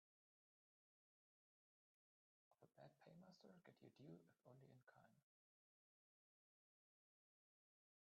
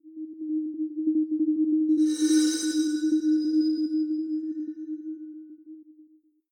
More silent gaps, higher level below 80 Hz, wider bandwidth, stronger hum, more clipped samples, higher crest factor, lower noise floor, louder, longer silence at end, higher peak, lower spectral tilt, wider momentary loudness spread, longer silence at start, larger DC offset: neither; second, under -90 dBFS vs -82 dBFS; second, 4.8 kHz vs 11.5 kHz; neither; neither; first, 22 dB vs 14 dB; first, under -90 dBFS vs -59 dBFS; second, -68 LUFS vs -26 LUFS; first, 2.85 s vs 0.5 s; second, -52 dBFS vs -12 dBFS; first, -6 dB/octave vs -2 dB/octave; second, 4 LU vs 17 LU; first, 2.5 s vs 0.05 s; neither